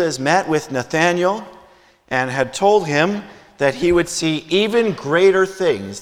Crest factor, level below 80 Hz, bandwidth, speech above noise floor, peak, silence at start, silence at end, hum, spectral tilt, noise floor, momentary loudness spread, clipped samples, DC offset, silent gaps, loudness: 16 dB; -48 dBFS; 14.5 kHz; 33 dB; -2 dBFS; 0 s; 0 s; none; -4.5 dB/octave; -50 dBFS; 6 LU; under 0.1%; under 0.1%; none; -17 LUFS